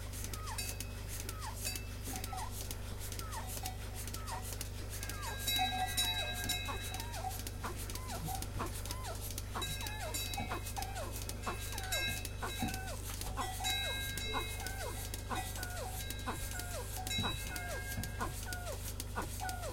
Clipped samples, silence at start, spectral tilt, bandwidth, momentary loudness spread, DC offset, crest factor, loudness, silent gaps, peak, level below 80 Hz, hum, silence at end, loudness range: under 0.1%; 0 s; -3 dB/octave; 17 kHz; 8 LU; under 0.1%; 20 dB; -39 LUFS; none; -20 dBFS; -46 dBFS; 50 Hz at -45 dBFS; 0 s; 5 LU